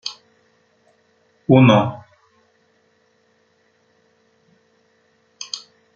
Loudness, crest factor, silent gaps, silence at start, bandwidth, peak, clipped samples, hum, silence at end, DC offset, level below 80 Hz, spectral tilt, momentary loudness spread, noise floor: -17 LUFS; 22 dB; none; 0.05 s; 7.6 kHz; -2 dBFS; under 0.1%; none; 0.35 s; under 0.1%; -62 dBFS; -6.5 dB/octave; 23 LU; -62 dBFS